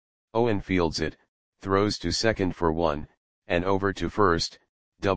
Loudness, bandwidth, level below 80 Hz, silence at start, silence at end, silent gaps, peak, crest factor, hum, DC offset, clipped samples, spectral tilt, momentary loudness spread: -26 LUFS; 9.8 kHz; -46 dBFS; 0.25 s; 0 s; 1.28-1.52 s, 3.17-3.42 s, 4.69-4.92 s; -6 dBFS; 20 dB; none; 0.8%; under 0.1%; -5 dB/octave; 8 LU